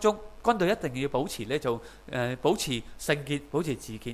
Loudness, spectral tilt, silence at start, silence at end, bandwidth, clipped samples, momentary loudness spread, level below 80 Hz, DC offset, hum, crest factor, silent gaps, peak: -30 LUFS; -5 dB/octave; 0 s; 0 s; 15.5 kHz; under 0.1%; 7 LU; -52 dBFS; 0.1%; none; 20 dB; none; -8 dBFS